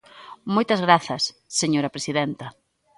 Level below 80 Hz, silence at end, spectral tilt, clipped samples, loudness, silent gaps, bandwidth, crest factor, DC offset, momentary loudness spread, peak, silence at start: -64 dBFS; 0.45 s; -4 dB/octave; under 0.1%; -22 LUFS; none; 11.5 kHz; 22 dB; under 0.1%; 16 LU; 0 dBFS; 0.15 s